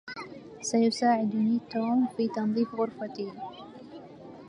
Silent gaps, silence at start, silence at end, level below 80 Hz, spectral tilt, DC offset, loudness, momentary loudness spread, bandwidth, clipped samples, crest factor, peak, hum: none; 0.05 s; 0 s; -72 dBFS; -5 dB/octave; under 0.1%; -28 LUFS; 20 LU; 11 kHz; under 0.1%; 16 dB; -12 dBFS; none